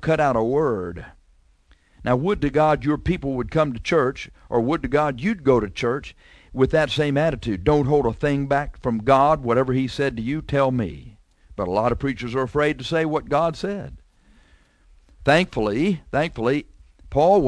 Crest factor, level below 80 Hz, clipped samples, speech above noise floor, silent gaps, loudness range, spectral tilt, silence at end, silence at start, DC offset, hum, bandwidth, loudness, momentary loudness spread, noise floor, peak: 18 dB; -40 dBFS; under 0.1%; 36 dB; none; 4 LU; -7 dB/octave; 0 s; 0 s; under 0.1%; none; 11 kHz; -22 LUFS; 10 LU; -57 dBFS; -4 dBFS